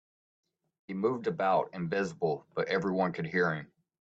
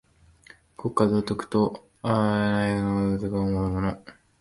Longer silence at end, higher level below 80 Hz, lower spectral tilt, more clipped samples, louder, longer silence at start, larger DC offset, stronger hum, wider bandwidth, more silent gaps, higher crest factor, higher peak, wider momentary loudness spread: about the same, 0.35 s vs 0.3 s; second, -74 dBFS vs -46 dBFS; about the same, -7 dB/octave vs -7.5 dB/octave; neither; second, -31 LUFS vs -25 LUFS; about the same, 0.9 s vs 0.8 s; neither; neither; second, 8 kHz vs 11.5 kHz; neither; about the same, 18 dB vs 18 dB; second, -16 dBFS vs -8 dBFS; about the same, 5 LU vs 7 LU